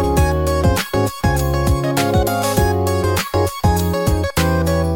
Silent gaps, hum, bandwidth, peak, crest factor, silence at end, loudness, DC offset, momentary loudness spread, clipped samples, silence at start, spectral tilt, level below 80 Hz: none; none; 17.5 kHz; -4 dBFS; 12 dB; 0 s; -17 LUFS; under 0.1%; 2 LU; under 0.1%; 0 s; -5.5 dB/octave; -26 dBFS